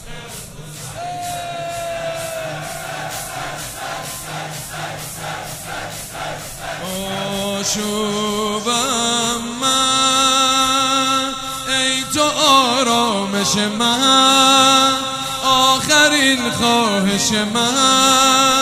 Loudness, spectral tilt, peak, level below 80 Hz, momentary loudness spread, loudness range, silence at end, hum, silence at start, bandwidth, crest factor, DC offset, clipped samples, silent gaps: -15 LUFS; -2 dB/octave; 0 dBFS; -46 dBFS; 16 LU; 14 LU; 0 s; none; 0 s; 16 kHz; 18 dB; under 0.1%; under 0.1%; none